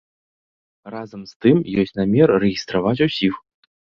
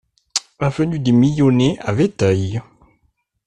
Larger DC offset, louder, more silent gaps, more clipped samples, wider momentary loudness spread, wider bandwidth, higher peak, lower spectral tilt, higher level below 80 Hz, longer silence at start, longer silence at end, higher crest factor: neither; about the same, -18 LUFS vs -17 LUFS; first, 1.36-1.40 s vs none; neither; first, 19 LU vs 10 LU; second, 7 kHz vs 11 kHz; about the same, -2 dBFS vs -2 dBFS; about the same, -7 dB/octave vs -6 dB/octave; about the same, -52 dBFS vs -48 dBFS; first, 0.85 s vs 0.35 s; second, 0.6 s vs 0.85 s; about the same, 18 dB vs 16 dB